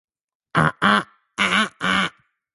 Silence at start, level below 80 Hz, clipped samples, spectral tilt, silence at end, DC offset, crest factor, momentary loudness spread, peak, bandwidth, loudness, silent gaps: 0.55 s; -54 dBFS; under 0.1%; -4 dB/octave; 0.45 s; under 0.1%; 20 dB; 7 LU; -2 dBFS; 11.5 kHz; -20 LUFS; none